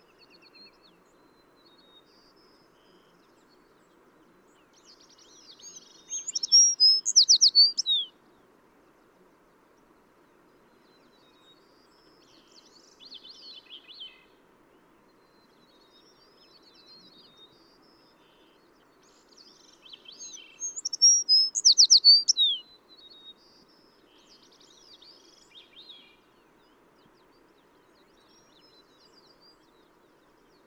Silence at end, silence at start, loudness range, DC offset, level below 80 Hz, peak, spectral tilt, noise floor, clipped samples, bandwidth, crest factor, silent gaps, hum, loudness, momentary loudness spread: 8.05 s; 5.65 s; 16 LU; under 0.1%; -78 dBFS; -8 dBFS; 3.5 dB/octave; -62 dBFS; under 0.1%; 18 kHz; 22 dB; none; none; -18 LUFS; 30 LU